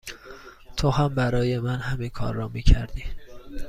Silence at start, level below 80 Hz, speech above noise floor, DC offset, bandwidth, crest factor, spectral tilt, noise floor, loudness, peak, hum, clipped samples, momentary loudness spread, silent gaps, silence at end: 0.05 s; -28 dBFS; 22 dB; under 0.1%; 14.5 kHz; 22 dB; -6.5 dB/octave; -44 dBFS; -26 LUFS; -2 dBFS; none; under 0.1%; 20 LU; none; 0 s